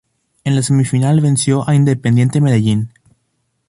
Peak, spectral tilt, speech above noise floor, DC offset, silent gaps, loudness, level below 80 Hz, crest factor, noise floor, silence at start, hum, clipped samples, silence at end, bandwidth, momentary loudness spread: -2 dBFS; -6.5 dB/octave; 54 dB; under 0.1%; none; -14 LUFS; -50 dBFS; 12 dB; -67 dBFS; 0.45 s; none; under 0.1%; 0.8 s; 11.5 kHz; 6 LU